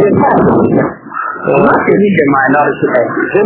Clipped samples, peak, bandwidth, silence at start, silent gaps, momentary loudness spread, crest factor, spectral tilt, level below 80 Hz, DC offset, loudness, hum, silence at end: 0.5%; 0 dBFS; 4 kHz; 0 s; none; 8 LU; 10 dB; -11.5 dB/octave; -40 dBFS; under 0.1%; -10 LUFS; none; 0 s